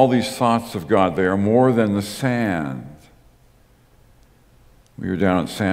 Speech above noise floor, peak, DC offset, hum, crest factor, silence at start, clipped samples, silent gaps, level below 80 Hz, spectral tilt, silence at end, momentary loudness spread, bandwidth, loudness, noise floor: 35 dB; 0 dBFS; under 0.1%; none; 20 dB; 0 s; under 0.1%; none; -54 dBFS; -6.5 dB/octave; 0 s; 12 LU; 16 kHz; -20 LUFS; -54 dBFS